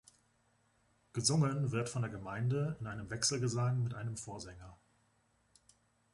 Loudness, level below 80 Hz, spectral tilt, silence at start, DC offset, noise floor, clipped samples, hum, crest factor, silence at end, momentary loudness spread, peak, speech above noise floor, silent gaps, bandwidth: -36 LUFS; -64 dBFS; -4.5 dB/octave; 1.15 s; under 0.1%; -74 dBFS; under 0.1%; none; 22 dB; 1.4 s; 13 LU; -16 dBFS; 39 dB; none; 11.5 kHz